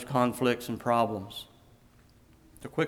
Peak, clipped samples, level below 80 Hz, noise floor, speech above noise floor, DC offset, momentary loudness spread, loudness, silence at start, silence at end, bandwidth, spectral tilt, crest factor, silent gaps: -12 dBFS; under 0.1%; -62 dBFS; -59 dBFS; 31 dB; under 0.1%; 18 LU; -29 LUFS; 0 s; 0 s; 19 kHz; -5.5 dB/octave; 20 dB; none